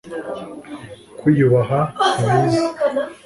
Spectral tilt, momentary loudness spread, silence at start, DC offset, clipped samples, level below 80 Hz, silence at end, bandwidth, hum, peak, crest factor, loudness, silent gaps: -6.5 dB/octave; 20 LU; 0.05 s; under 0.1%; under 0.1%; -52 dBFS; 0.1 s; 11.5 kHz; none; -4 dBFS; 16 dB; -18 LUFS; none